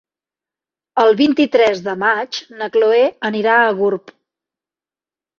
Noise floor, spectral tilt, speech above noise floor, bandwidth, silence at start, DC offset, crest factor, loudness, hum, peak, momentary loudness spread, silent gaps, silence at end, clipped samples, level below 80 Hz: under -90 dBFS; -5 dB/octave; over 75 dB; 7.2 kHz; 0.95 s; under 0.1%; 16 dB; -15 LUFS; none; -2 dBFS; 10 LU; none; 1.4 s; under 0.1%; -64 dBFS